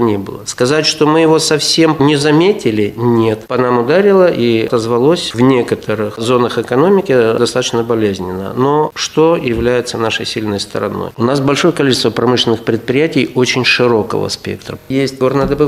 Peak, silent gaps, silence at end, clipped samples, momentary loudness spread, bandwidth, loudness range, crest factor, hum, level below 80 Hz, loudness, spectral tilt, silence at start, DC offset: 0 dBFS; none; 0 s; under 0.1%; 8 LU; 15 kHz; 3 LU; 12 dB; none; -42 dBFS; -13 LUFS; -5 dB/octave; 0 s; under 0.1%